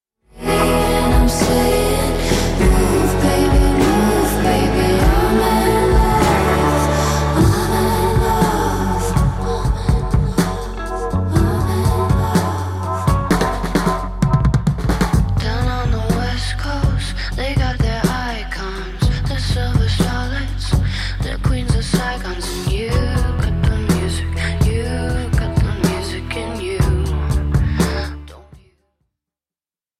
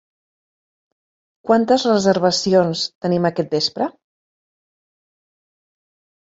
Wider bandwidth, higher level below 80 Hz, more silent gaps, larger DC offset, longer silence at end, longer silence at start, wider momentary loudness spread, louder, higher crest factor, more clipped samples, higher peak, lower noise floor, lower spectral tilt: first, 15.5 kHz vs 8 kHz; first, -22 dBFS vs -62 dBFS; second, none vs 2.95-3.01 s; neither; second, 1.6 s vs 2.4 s; second, 0.35 s vs 1.45 s; about the same, 8 LU vs 8 LU; about the same, -18 LUFS vs -18 LUFS; second, 12 dB vs 20 dB; neither; about the same, -4 dBFS vs -2 dBFS; about the same, under -90 dBFS vs under -90 dBFS; about the same, -6 dB/octave vs -5 dB/octave